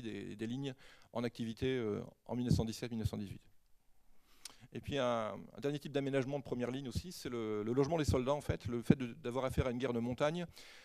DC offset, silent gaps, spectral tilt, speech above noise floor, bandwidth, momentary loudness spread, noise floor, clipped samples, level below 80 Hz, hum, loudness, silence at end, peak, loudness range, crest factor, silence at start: under 0.1%; none; -6.5 dB/octave; 27 dB; 14.5 kHz; 12 LU; -65 dBFS; under 0.1%; -56 dBFS; none; -38 LUFS; 0 s; -12 dBFS; 5 LU; 26 dB; 0 s